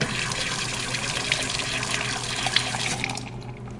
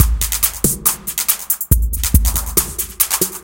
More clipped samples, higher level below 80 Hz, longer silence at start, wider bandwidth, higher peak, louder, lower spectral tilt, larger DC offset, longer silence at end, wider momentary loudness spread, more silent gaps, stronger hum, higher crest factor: neither; second, -46 dBFS vs -22 dBFS; about the same, 0 s vs 0 s; second, 11.5 kHz vs 18 kHz; second, -6 dBFS vs 0 dBFS; second, -25 LUFS vs -16 LUFS; about the same, -2 dB/octave vs -3 dB/octave; neither; about the same, 0 s vs 0 s; first, 6 LU vs 2 LU; neither; neither; first, 22 dB vs 16 dB